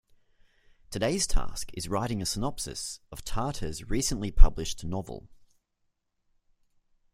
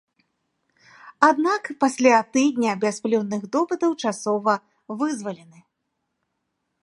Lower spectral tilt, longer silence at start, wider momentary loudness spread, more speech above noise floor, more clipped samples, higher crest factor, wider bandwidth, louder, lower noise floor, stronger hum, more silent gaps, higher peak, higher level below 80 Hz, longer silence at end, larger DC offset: about the same, -4 dB/octave vs -4.5 dB/octave; second, 0.9 s vs 1.05 s; about the same, 11 LU vs 10 LU; second, 52 dB vs 56 dB; neither; about the same, 24 dB vs 22 dB; first, 14.5 kHz vs 11.5 kHz; second, -31 LUFS vs -22 LUFS; about the same, -77 dBFS vs -77 dBFS; neither; neither; about the same, -2 dBFS vs 0 dBFS; first, -30 dBFS vs -76 dBFS; first, 1.9 s vs 1.45 s; neither